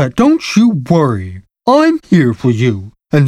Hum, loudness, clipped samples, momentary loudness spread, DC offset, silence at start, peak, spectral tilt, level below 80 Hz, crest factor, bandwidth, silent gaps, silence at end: none; -12 LUFS; under 0.1%; 9 LU; under 0.1%; 0 s; 0 dBFS; -7 dB/octave; -44 dBFS; 12 dB; 13 kHz; none; 0 s